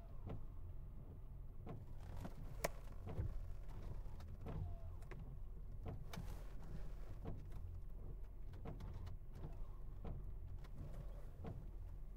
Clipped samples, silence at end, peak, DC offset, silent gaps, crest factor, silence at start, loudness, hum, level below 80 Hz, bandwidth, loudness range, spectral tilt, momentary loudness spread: under 0.1%; 0 s; -26 dBFS; under 0.1%; none; 22 dB; 0 s; -54 LUFS; none; -52 dBFS; 16 kHz; 3 LU; -6.5 dB/octave; 8 LU